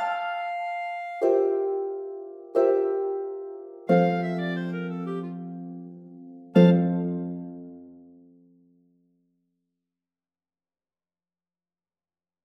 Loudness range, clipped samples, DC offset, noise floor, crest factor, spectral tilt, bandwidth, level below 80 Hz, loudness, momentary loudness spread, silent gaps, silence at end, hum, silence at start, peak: 4 LU; under 0.1%; under 0.1%; under -90 dBFS; 22 dB; -9.5 dB/octave; 6 kHz; -76 dBFS; -25 LUFS; 19 LU; none; 4.45 s; none; 0 s; -6 dBFS